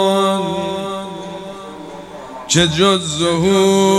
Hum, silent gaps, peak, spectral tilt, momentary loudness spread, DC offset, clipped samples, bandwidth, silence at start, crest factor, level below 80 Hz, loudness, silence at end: none; none; 0 dBFS; -4 dB/octave; 19 LU; under 0.1%; under 0.1%; 13.5 kHz; 0 s; 16 dB; -48 dBFS; -15 LUFS; 0 s